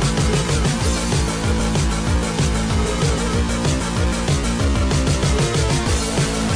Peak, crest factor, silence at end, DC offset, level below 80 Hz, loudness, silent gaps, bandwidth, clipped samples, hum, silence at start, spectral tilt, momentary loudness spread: -8 dBFS; 10 dB; 0 s; under 0.1%; -24 dBFS; -19 LUFS; none; 10.5 kHz; under 0.1%; none; 0 s; -4.5 dB/octave; 2 LU